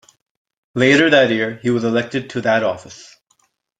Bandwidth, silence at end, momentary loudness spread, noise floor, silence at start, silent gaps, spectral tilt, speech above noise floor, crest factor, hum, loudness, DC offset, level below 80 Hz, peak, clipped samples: 9.4 kHz; 0.75 s; 12 LU; -63 dBFS; 0.75 s; none; -5 dB/octave; 46 dB; 18 dB; none; -16 LUFS; under 0.1%; -60 dBFS; 0 dBFS; under 0.1%